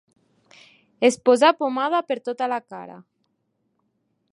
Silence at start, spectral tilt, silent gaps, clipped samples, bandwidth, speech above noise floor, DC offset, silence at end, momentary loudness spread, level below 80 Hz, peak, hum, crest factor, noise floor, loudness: 1 s; -3 dB/octave; none; under 0.1%; 11.5 kHz; 52 dB; under 0.1%; 1.35 s; 21 LU; -78 dBFS; -4 dBFS; none; 20 dB; -72 dBFS; -21 LUFS